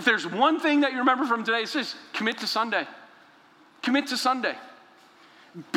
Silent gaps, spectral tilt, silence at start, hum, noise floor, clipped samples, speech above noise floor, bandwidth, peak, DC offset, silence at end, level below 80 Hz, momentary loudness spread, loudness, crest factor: none; -3 dB/octave; 0 s; none; -56 dBFS; under 0.1%; 31 dB; 16 kHz; -6 dBFS; under 0.1%; 0 s; -80 dBFS; 10 LU; -25 LUFS; 20 dB